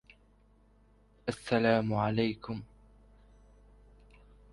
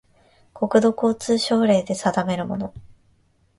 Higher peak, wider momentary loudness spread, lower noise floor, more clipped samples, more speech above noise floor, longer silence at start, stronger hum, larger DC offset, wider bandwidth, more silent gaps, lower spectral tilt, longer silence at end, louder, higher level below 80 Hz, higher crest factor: second, -14 dBFS vs -4 dBFS; first, 14 LU vs 10 LU; about the same, -64 dBFS vs -61 dBFS; neither; second, 33 dB vs 41 dB; first, 1.25 s vs 0.55 s; first, 50 Hz at -60 dBFS vs none; neither; about the same, 11.5 kHz vs 11.5 kHz; neither; first, -7 dB/octave vs -5.5 dB/octave; first, 1.9 s vs 0.75 s; second, -31 LUFS vs -21 LUFS; about the same, -60 dBFS vs -56 dBFS; about the same, 20 dB vs 18 dB